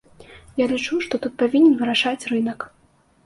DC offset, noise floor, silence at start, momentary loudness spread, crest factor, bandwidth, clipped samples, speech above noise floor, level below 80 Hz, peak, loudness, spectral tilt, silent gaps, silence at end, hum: under 0.1%; -46 dBFS; 0.2 s; 14 LU; 16 dB; 11.5 kHz; under 0.1%; 26 dB; -58 dBFS; -6 dBFS; -20 LUFS; -4 dB/octave; none; 0.6 s; none